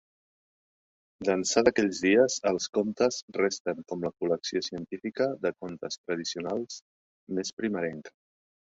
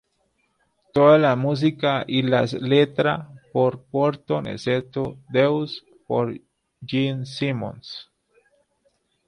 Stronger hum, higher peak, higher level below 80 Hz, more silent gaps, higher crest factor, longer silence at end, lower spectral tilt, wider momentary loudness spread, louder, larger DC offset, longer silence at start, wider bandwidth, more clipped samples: neither; about the same, -6 dBFS vs -4 dBFS; second, -66 dBFS vs -60 dBFS; first, 2.69-2.73 s, 3.22-3.28 s, 3.60-3.65 s, 5.98-6.04 s, 6.82-7.27 s, 7.53-7.57 s vs none; about the same, 22 dB vs 20 dB; second, 0.65 s vs 1.25 s; second, -3.5 dB/octave vs -7.5 dB/octave; about the same, 13 LU vs 14 LU; second, -29 LUFS vs -22 LUFS; neither; first, 1.2 s vs 0.95 s; second, 8 kHz vs 10.5 kHz; neither